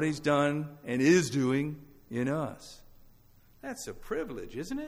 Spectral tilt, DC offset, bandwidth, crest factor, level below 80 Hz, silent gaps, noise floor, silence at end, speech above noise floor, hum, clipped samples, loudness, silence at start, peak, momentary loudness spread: -5.5 dB/octave; under 0.1%; over 20 kHz; 18 dB; -56 dBFS; none; -59 dBFS; 0 s; 29 dB; none; under 0.1%; -30 LUFS; 0 s; -12 dBFS; 19 LU